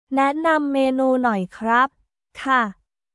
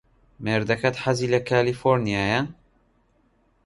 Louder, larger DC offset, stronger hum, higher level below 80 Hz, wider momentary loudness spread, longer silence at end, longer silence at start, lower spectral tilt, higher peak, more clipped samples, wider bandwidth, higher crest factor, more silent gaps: first, -20 LUFS vs -23 LUFS; neither; neither; second, -62 dBFS vs -52 dBFS; about the same, 6 LU vs 5 LU; second, 0.45 s vs 1.15 s; second, 0.1 s vs 0.4 s; about the same, -6 dB/octave vs -6 dB/octave; about the same, -6 dBFS vs -4 dBFS; neither; about the same, 11.5 kHz vs 11.5 kHz; second, 14 dB vs 20 dB; neither